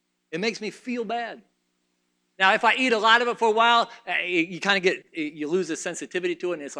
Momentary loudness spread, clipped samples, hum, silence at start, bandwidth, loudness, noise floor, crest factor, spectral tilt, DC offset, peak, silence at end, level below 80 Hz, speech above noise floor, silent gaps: 13 LU; under 0.1%; 60 Hz at -60 dBFS; 0.3 s; 11 kHz; -23 LUFS; -73 dBFS; 22 dB; -3 dB/octave; under 0.1%; -4 dBFS; 0 s; -78 dBFS; 49 dB; none